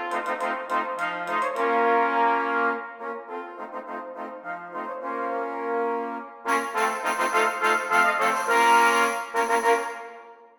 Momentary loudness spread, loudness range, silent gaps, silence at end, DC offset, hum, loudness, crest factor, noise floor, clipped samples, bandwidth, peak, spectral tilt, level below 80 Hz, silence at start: 15 LU; 10 LU; none; 0.1 s; under 0.1%; none; -24 LUFS; 18 dB; -46 dBFS; under 0.1%; 19 kHz; -8 dBFS; -2 dB/octave; -76 dBFS; 0 s